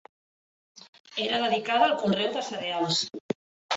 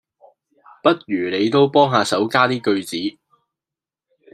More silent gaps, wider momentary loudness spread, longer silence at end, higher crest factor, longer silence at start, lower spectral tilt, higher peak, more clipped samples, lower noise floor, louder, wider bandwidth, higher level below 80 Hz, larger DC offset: first, 0.89-0.93 s, 1.00-1.04 s, 3.20-3.29 s, 3.35-3.69 s vs none; first, 13 LU vs 9 LU; second, 0 s vs 1.25 s; about the same, 20 dB vs 18 dB; about the same, 0.75 s vs 0.85 s; second, -3.5 dB/octave vs -5 dB/octave; second, -8 dBFS vs -2 dBFS; neither; about the same, under -90 dBFS vs -88 dBFS; second, -27 LUFS vs -18 LUFS; second, 8.2 kHz vs 13.5 kHz; second, -72 dBFS vs -66 dBFS; neither